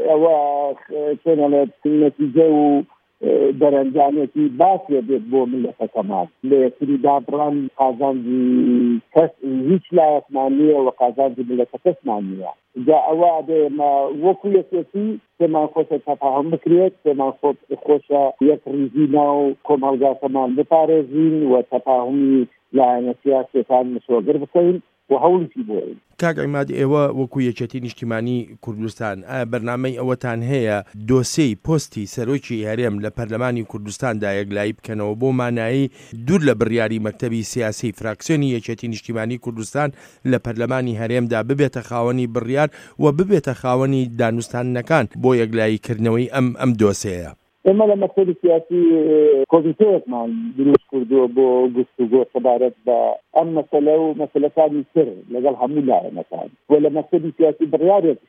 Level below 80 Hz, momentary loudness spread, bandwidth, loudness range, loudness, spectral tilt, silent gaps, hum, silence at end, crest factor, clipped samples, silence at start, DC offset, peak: -56 dBFS; 9 LU; 14 kHz; 6 LU; -18 LUFS; -7 dB/octave; none; none; 0.1 s; 18 dB; under 0.1%; 0 s; under 0.1%; 0 dBFS